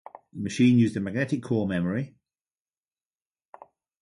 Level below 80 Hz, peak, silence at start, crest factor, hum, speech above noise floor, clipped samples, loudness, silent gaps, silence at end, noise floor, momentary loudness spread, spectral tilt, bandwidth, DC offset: -58 dBFS; -10 dBFS; 0.35 s; 18 dB; none; over 66 dB; under 0.1%; -25 LUFS; none; 1.95 s; under -90 dBFS; 15 LU; -7 dB/octave; 11 kHz; under 0.1%